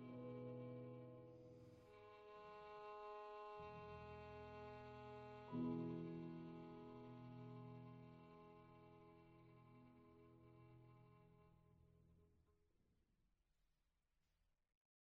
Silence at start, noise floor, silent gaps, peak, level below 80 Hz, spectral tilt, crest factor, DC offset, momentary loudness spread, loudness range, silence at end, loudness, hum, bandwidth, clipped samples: 0 s; -87 dBFS; none; -36 dBFS; -80 dBFS; -7 dB/octave; 20 dB; under 0.1%; 17 LU; 14 LU; 2.1 s; -56 LUFS; none; 6.8 kHz; under 0.1%